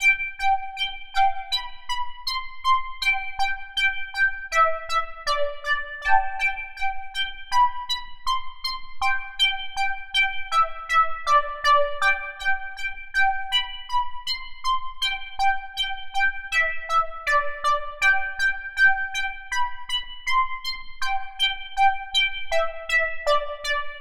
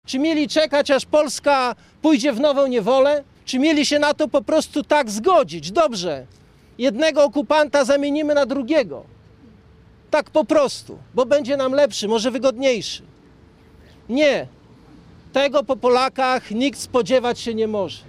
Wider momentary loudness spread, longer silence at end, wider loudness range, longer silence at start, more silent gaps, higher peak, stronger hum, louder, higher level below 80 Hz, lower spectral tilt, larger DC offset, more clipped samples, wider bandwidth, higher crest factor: about the same, 8 LU vs 7 LU; about the same, 0 s vs 0.1 s; about the same, 3 LU vs 4 LU; about the same, 0 s vs 0.1 s; neither; about the same, -4 dBFS vs -4 dBFS; neither; second, -24 LUFS vs -19 LUFS; first, -42 dBFS vs -56 dBFS; second, 1 dB/octave vs -3.5 dB/octave; neither; neither; about the same, 14.5 kHz vs 14 kHz; about the same, 18 dB vs 16 dB